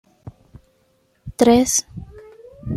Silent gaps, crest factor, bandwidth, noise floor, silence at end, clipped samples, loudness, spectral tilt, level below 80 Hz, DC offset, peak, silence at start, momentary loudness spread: none; 20 dB; 15 kHz; -62 dBFS; 0 s; under 0.1%; -16 LUFS; -4 dB/octave; -46 dBFS; under 0.1%; -2 dBFS; 0.25 s; 24 LU